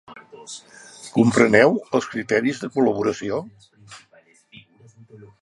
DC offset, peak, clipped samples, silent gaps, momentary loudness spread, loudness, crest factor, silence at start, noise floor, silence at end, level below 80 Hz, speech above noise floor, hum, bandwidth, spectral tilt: under 0.1%; 0 dBFS; under 0.1%; none; 23 LU; -20 LUFS; 22 dB; 0.1 s; -55 dBFS; 0.15 s; -60 dBFS; 35 dB; none; 11.5 kHz; -5.5 dB/octave